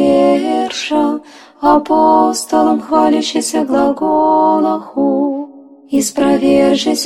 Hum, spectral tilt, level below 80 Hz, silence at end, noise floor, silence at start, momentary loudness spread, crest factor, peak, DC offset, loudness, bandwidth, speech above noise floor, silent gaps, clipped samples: none; -4 dB/octave; -48 dBFS; 0 s; -34 dBFS; 0 s; 6 LU; 12 dB; 0 dBFS; under 0.1%; -13 LUFS; 16 kHz; 22 dB; none; under 0.1%